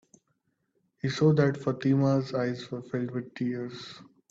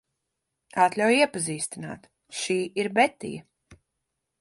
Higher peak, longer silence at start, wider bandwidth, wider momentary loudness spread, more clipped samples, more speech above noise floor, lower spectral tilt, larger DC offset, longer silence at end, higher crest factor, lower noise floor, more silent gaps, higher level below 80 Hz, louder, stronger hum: second, -12 dBFS vs -6 dBFS; first, 1.05 s vs 0.75 s; second, 7.8 kHz vs 11.5 kHz; second, 13 LU vs 17 LU; neither; second, 48 dB vs 57 dB; first, -7.5 dB/octave vs -3.5 dB/octave; neither; second, 0.25 s vs 0.65 s; about the same, 18 dB vs 22 dB; second, -76 dBFS vs -82 dBFS; neither; about the same, -66 dBFS vs -68 dBFS; second, -28 LUFS vs -25 LUFS; neither